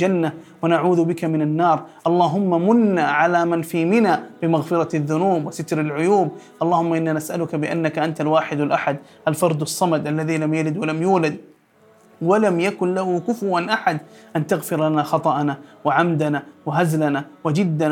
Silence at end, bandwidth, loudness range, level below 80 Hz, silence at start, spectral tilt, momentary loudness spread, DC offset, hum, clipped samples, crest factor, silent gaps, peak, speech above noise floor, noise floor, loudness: 0 s; 17.5 kHz; 3 LU; -72 dBFS; 0 s; -6.5 dB/octave; 7 LU; under 0.1%; none; under 0.1%; 18 dB; none; -2 dBFS; 34 dB; -54 dBFS; -20 LUFS